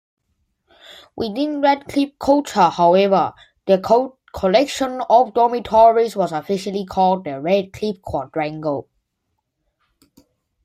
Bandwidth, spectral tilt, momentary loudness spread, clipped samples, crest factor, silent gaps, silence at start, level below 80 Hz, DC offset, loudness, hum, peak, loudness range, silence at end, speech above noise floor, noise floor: 15.5 kHz; -5.5 dB/octave; 12 LU; under 0.1%; 16 dB; none; 0.9 s; -52 dBFS; under 0.1%; -18 LUFS; none; -2 dBFS; 6 LU; 1.8 s; 57 dB; -74 dBFS